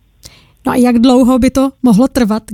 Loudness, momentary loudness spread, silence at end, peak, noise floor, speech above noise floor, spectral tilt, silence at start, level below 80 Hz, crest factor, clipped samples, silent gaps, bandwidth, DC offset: -10 LUFS; 6 LU; 0 s; 0 dBFS; -41 dBFS; 31 dB; -6 dB/octave; 0.65 s; -34 dBFS; 10 dB; under 0.1%; none; 14.5 kHz; under 0.1%